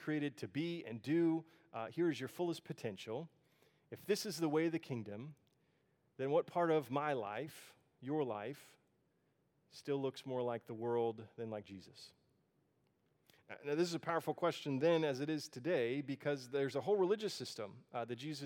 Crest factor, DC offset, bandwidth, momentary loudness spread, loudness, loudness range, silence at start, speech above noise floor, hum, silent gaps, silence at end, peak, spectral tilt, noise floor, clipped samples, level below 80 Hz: 18 dB; under 0.1%; 18.5 kHz; 16 LU; -40 LUFS; 7 LU; 0 s; 40 dB; none; none; 0 s; -22 dBFS; -6 dB/octave; -79 dBFS; under 0.1%; under -90 dBFS